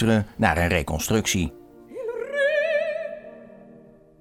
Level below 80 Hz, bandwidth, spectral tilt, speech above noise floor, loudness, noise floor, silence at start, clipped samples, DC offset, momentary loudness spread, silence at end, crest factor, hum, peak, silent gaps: -42 dBFS; 17 kHz; -4.5 dB/octave; 28 dB; -24 LUFS; -50 dBFS; 0 s; under 0.1%; under 0.1%; 14 LU; 0.4 s; 20 dB; none; -4 dBFS; none